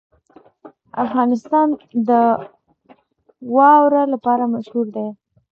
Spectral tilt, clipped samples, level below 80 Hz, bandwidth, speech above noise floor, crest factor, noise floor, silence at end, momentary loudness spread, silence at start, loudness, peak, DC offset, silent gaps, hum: -8 dB/octave; under 0.1%; -68 dBFS; 6.6 kHz; 40 dB; 16 dB; -56 dBFS; 0.4 s; 14 LU; 0.65 s; -17 LUFS; -2 dBFS; under 0.1%; none; none